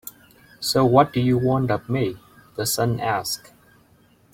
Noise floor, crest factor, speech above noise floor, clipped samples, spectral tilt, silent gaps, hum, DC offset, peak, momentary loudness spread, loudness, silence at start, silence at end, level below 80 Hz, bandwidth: -57 dBFS; 20 dB; 36 dB; under 0.1%; -5 dB/octave; none; none; under 0.1%; -2 dBFS; 14 LU; -21 LUFS; 0.05 s; 0.95 s; -54 dBFS; 16.5 kHz